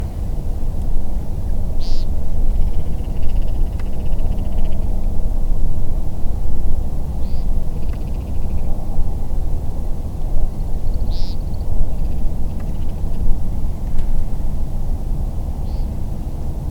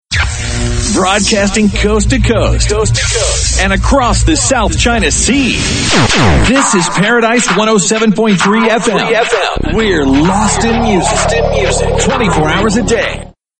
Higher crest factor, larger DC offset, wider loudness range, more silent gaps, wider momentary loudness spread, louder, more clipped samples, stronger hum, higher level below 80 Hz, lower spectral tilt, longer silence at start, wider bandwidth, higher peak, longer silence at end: about the same, 14 dB vs 10 dB; neither; about the same, 1 LU vs 2 LU; neither; about the same, 2 LU vs 4 LU; second, -26 LUFS vs -10 LUFS; neither; neither; about the same, -18 dBFS vs -20 dBFS; first, -8 dB/octave vs -4 dB/octave; about the same, 0 s vs 0.1 s; second, 5.2 kHz vs 9.2 kHz; about the same, 0 dBFS vs 0 dBFS; second, 0 s vs 0.3 s